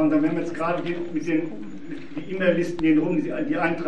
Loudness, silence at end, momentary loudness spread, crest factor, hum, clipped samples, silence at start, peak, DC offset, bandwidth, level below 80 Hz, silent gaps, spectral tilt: -24 LUFS; 0 s; 14 LU; 16 dB; none; under 0.1%; 0 s; -8 dBFS; 2%; 8.4 kHz; -58 dBFS; none; -7.5 dB/octave